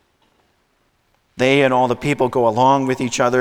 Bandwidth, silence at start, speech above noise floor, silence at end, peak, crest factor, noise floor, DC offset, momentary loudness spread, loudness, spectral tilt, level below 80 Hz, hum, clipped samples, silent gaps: 15.5 kHz; 1.35 s; 47 dB; 0 s; -2 dBFS; 16 dB; -63 dBFS; under 0.1%; 5 LU; -16 LUFS; -5 dB/octave; -52 dBFS; none; under 0.1%; none